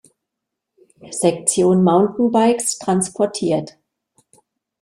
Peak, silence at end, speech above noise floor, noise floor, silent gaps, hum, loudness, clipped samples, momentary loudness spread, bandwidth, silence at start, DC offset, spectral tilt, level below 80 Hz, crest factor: -2 dBFS; 1.15 s; 64 dB; -81 dBFS; none; none; -17 LUFS; under 0.1%; 7 LU; 14 kHz; 1.05 s; under 0.1%; -5 dB/octave; -60 dBFS; 18 dB